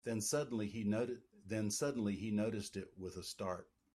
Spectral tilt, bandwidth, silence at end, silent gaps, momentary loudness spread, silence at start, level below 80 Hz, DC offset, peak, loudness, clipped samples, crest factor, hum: -5 dB/octave; 14 kHz; 0.3 s; none; 10 LU; 0.05 s; -72 dBFS; under 0.1%; -24 dBFS; -40 LUFS; under 0.1%; 16 dB; none